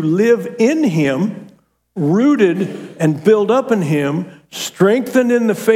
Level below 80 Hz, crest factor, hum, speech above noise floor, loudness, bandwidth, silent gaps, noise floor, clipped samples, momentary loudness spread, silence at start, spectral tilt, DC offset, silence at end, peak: -66 dBFS; 14 dB; none; 33 dB; -15 LUFS; 16.5 kHz; none; -47 dBFS; under 0.1%; 11 LU; 0 s; -6.5 dB/octave; under 0.1%; 0 s; 0 dBFS